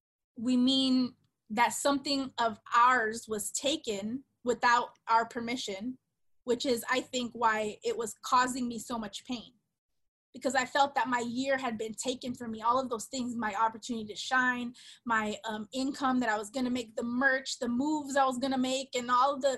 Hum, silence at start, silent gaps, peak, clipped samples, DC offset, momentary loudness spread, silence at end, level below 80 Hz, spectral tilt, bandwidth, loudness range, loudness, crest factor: none; 0.35 s; 9.78-9.89 s, 10.08-10.33 s; -14 dBFS; under 0.1%; under 0.1%; 11 LU; 0 s; -70 dBFS; -2.5 dB/octave; 13 kHz; 4 LU; -31 LUFS; 18 dB